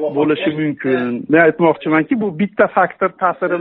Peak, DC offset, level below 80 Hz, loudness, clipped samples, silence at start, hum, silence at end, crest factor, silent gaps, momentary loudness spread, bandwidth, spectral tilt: 0 dBFS; under 0.1%; -60 dBFS; -16 LUFS; under 0.1%; 0 s; none; 0 s; 16 dB; none; 6 LU; 4.1 kHz; -5 dB/octave